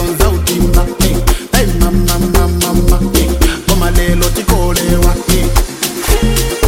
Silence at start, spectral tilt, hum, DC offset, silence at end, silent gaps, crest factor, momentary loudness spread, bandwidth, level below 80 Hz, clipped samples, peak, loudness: 0 s; -4.5 dB/octave; none; under 0.1%; 0 s; none; 10 dB; 2 LU; 17 kHz; -14 dBFS; under 0.1%; 0 dBFS; -13 LUFS